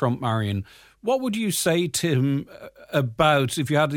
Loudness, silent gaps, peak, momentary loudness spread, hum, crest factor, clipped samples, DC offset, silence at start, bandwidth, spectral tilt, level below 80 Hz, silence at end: -23 LUFS; none; -6 dBFS; 12 LU; none; 18 dB; under 0.1%; under 0.1%; 0 s; 17.5 kHz; -5 dB/octave; -54 dBFS; 0 s